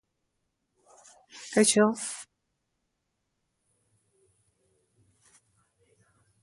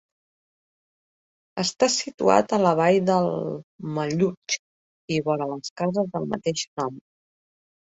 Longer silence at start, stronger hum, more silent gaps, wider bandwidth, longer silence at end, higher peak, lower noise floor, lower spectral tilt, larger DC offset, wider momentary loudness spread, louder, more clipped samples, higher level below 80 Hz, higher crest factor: second, 1.35 s vs 1.55 s; neither; second, none vs 3.64-3.79 s, 4.37-4.42 s, 4.59-5.08 s, 5.70-5.76 s, 6.67-6.77 s; first, 11.5 kHz vs 8.2 kHz; first, 4.2 s vs 0.9 s; second, -8 dBFS vs -2 dBFS; second, -80 dBFS vs under -90 dBFS; second, -3 dB/octave vs -4.5 dB/octave; neither; first, 24 LU vs 12 LU; about the same, -25 LUFS vs -24 LUFS; neither; second, -76 dBFS vs -64 dBFS; about the same, 24 dB vs 22 dB